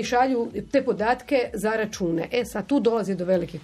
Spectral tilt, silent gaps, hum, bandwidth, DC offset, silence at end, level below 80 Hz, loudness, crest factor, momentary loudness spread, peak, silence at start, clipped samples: -5.5 dB/octave; none; none; 14 kHz; under 0.1%; 0 s; -52 dBFS; -24 LUFS; 16 dB; 5 LU; -8 dBFS; 0 s; under 0.1%